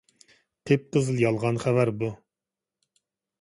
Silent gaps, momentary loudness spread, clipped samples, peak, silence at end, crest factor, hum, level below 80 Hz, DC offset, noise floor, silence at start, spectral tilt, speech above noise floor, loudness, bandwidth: none; 9 LU; under 0.1%; -8 dBFS; 1.25 s; 20 dB; none; -62 dBFS; under 0.1%; -89 dBFS; 0.65 s; -7 dB/octave; 65 dB; -25 LUFS; 11.5 kHz